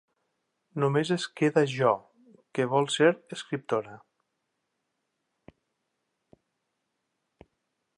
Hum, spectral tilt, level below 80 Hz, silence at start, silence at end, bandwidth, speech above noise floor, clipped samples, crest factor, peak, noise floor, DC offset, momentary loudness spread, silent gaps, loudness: none; -5.5 dB/octave; -76 dBFS; 0.75 s; 4 s; 11 kHz; 54 dB; under 0.1%; 24 dB; -8 dBFS; -81 dBFS; under 0.1%; 12 LU; none; -27 LUFS